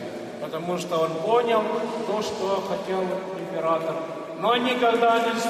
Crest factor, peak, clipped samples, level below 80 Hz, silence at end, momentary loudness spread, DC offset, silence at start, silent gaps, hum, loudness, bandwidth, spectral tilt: 14 dB; -10 dBFS; under 0.1%; -68 dBFS; 0 s; 11 LU; under 0.1%; 0 s; none; none; -25 LUFS; 15 kHz; -4.5 dB/octave